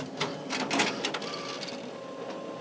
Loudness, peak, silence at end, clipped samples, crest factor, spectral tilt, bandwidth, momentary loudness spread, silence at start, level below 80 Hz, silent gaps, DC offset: -32 LUFS; -12 dBFS; 0 s; under 0.1%; 22 dB; -3 dB/octave; 8 kHz; 12 LU; 0 s; -74 dBFS; none; under 0.1%